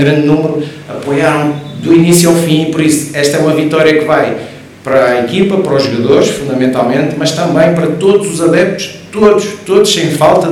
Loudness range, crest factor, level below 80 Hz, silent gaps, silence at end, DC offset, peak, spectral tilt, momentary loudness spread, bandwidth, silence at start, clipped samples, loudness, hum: 1 LU; 10 dB; -46 dBFS; none; 0 s; under 0.1%; 0 dBFS; -5 dB/octave; 8 LU; over 20 kHz; 0 s; 2%; -10 LUFS; none